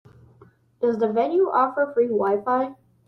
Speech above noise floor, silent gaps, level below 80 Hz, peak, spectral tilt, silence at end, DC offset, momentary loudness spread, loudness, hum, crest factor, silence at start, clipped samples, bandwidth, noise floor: 33 dB; none; -70 dBFS; -10 dBFS; -8.5 dB/octave; 0.35 s; under 0.1%; 5 LU; -22 LUFS; none; 14 dB; 0.8 s; under 0.1%; 6 kHz; -54 dBFS